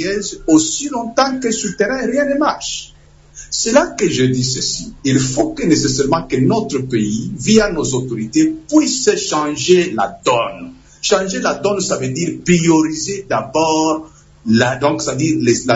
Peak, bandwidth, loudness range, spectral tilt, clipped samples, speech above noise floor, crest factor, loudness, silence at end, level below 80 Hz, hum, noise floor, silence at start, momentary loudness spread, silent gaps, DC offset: 0 dBFS; 8 kHz; 2 LU; -4.5 dB/octave; under 0.1%; 24 dB; 16 dB; -16 LUFS; 0 s; -42 dBFS; none; -40 dBFS; 0 s; 7 LU; none; under 0.1%